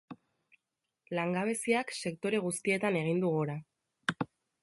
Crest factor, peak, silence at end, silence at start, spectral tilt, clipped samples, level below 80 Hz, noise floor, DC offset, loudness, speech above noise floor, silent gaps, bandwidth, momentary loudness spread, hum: 20 dB; -14 dBFS; 0.35 s; 0.1 s; -5 dB/octave; under 0.1%; -76 dBFS; -87 dBFS; under 0.1%; -33 LUFS; 55 dB; none; 12 kHz; 11 LU; none